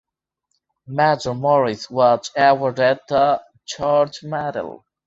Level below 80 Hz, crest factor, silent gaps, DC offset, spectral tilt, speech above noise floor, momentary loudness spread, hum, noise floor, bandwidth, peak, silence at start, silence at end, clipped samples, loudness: -60 dBFS; 16 dB; none; under 0.1%; -5 dB/octave; 58 dB; 10 LU; none; -76 dBFS; 8 kHz; -2 dBFS; 0.9 s; 0.35 s; under 0.1%; -19 LUFS